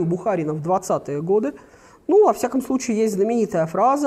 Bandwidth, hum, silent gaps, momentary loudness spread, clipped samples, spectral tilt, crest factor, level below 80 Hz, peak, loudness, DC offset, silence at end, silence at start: 15 kHz; none; none; 8 LU; under 0.1%; -6.5 dB/octave; 16 dB; -60 dBFS; -6 dBFS; -21 LUFS; under 0.1%; 0 s; 0 s